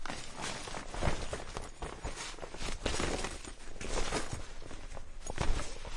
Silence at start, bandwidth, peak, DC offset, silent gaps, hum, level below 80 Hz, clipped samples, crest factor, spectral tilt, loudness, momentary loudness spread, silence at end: 0 s; 11.5 kHz; -16 dBFS; under 0.1%; none; none; -40 dBFS; under 0.1%; 18 dB; -3.5 dB/octave; -40 LUFS; 12 LU; 0 s